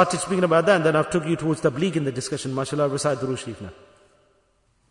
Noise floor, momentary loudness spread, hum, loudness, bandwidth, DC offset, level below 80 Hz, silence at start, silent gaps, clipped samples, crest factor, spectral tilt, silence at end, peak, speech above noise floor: -65 dBFS; 11 LU; none; -22 LUFS; 11 kHz; under 0.1%; -58 dBFS; 0 s; none; under 0.1%; 20 dB; -5.5 dB/octave; 1.2 s; -4 dBFS; 43 dB